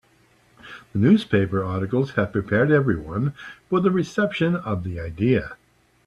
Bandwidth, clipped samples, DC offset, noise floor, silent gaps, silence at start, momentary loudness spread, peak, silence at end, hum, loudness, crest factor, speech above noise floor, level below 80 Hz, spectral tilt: 11 kHz; under 0.1%; under 0.1%; -59 dBFS; none; 0.65 s; 12 LU; -4 dBFS; 0.55 s; none; -22 LUFS; 18 dB; 37 dB; -50 dBFS; -8 dB/octave